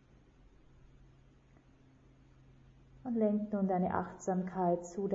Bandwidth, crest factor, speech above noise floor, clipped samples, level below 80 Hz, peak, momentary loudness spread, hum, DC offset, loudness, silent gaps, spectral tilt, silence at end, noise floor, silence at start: 7.6 kHz; 20 dB; 30 dB; under 0.1%; -64 dBFS; -18 dBFS; 5 LU; none; under 0.1%; -34 LUFS; none; -9.5 dB/octave; 0 s; -63 dBFS; 2.95 s